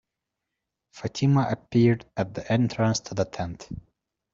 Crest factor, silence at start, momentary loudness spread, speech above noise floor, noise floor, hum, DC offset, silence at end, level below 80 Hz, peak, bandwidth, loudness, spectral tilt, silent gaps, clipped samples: 18 dB; 0.95 s; 14 LU; 60 dB; -85 dBFS; none; under 0.1%; 0.55 s; -56 dBFS; -8 dBFS; 7.6 kHz; -25 LUFS; -7 dB/octave; none; under 0.1%